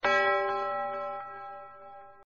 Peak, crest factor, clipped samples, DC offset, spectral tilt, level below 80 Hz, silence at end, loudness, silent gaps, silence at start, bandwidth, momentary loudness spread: -16 dBFS; 16 dB; under 0.1%; 0.1%; 0 dB/octave; -70 dBFS; 0.1 s; -30 LUFS; none; 0.05 s; 7.4 kHz; 23 LU